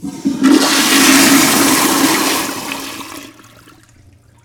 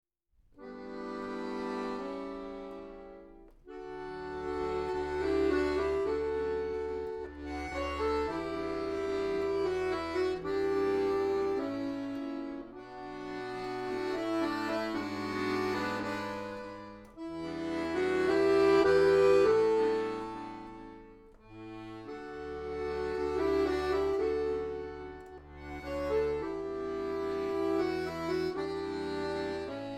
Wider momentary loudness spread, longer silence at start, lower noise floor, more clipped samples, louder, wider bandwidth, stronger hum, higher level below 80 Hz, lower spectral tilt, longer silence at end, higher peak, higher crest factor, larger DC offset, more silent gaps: about the same, 18 LU vs 17 LU; second, 0 s vs 0.55 s; second, -46 dBFS vs -68 dBFS; neither; first, -10 LUFS vs -32 LUFS; first, over 20 kHz vs 11 kHz; neither; about the same, -52 dBFS vs -54 dBFS; second, -1.5 dB/octave vs -6 dB/octave; first, 1.15 s vs 0 s; first, 0 dBFS vs -14 dBFS; about the same, 14 dB vs 18 dB; neither; neither